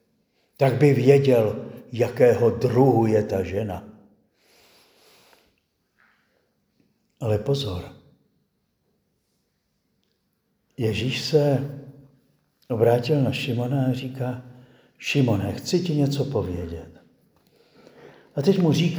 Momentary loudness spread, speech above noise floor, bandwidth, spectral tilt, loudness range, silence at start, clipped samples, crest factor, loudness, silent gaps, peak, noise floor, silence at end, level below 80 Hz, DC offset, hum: 15 LU; 51 dB; over 20 kHz; -7 dB/octave; 13 LU; 0.6 s; under 0.1%; 22 dB; -22 LUFS; none; -2 dBFS; -72 dBFS; 0 s; -56 dBFS; under 0.1%; none